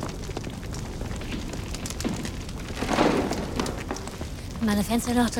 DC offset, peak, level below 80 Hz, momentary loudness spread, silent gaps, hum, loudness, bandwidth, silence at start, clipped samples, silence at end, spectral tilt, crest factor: under 0.1%; -8 dBFS; -38 dBFS; 11 LU; none; none; -29 LUFS; 19 kHz; 0 s; under 0.1%; 0 s; -5 dB/octave; 20 dB